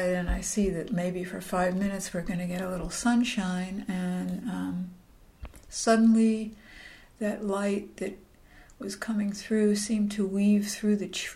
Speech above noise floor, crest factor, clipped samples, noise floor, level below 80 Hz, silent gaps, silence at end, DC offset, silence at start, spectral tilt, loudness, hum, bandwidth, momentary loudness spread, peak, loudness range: 26 dB; 18 dB; under 0.1%; -54 dBFS; -46 dBFS; none; 0 s; under 0.1%; 0 s; -5 dB/octave; -28 LUFS; none; 15 kHz; 14 LU; -12 dBFS; 3 LU